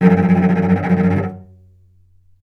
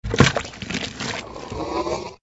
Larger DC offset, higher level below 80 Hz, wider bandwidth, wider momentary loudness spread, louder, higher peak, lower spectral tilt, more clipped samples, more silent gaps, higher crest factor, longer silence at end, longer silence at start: neither; second, -50 dBFS vs -40 dBFS; second, 4.2 kHz vs 8 kHz; second, 8 LU vs 13 LU; first, -15 LUFS vs -24 LUFS; about the same, 0 dBFS vs 0 dBFS; first, -10 dB/octave vs -4.5 dB/octave; neither; neither; second, 16 dB vs 24 dB; first, 1 s vs 0.05 s; about the same, 0 s vs 0.05 s